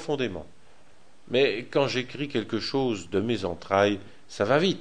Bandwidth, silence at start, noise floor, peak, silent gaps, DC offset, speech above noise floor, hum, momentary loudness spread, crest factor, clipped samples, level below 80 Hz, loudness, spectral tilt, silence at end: 10 kHz; 0 s; -59 dBFS; -6 dBFS; none; 0.6%; 33 dB; none; 7 LU; 22 dB; under 0.1%; -60 dBFS; -27 LUFS; -5.5 dB/octave; 0 s